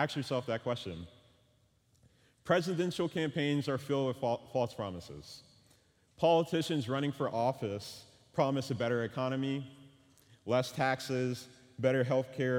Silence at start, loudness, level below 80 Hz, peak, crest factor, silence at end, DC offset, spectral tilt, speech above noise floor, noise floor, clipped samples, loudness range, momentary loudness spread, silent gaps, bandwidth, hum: 0 s; -34 LUFS; -70 dBFS; -14 dBFS; 20 dB; 0 s; under 0.1%; -6 dB/octave; 37 dB; -70 dBFS; under 0.1%; 2 LU; 17 LU; none; 17.5 kHz; none